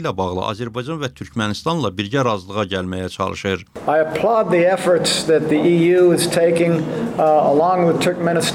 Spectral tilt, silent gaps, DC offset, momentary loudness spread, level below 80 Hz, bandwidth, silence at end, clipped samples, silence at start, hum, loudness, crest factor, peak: -5 dB/octave; none; under 0.1%; 10 LU; -54 dBFS; 16.5 kHz; 0 s; under 0.1%; 0 s; none; -18 LUFS; 12 dB; -6 dBFS